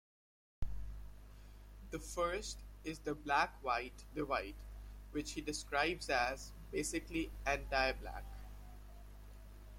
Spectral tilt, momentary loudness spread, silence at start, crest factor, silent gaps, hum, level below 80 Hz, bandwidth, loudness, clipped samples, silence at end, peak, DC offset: -3.5 dB/octave; 22 LU; 0.6 s; 22 dB; none; 50 Hz at -55 dBFS; -52 dBFS; 16.5 kHz; -40 LUFS; under 0.1%; 0 s; -20 dBFS; under 0.1%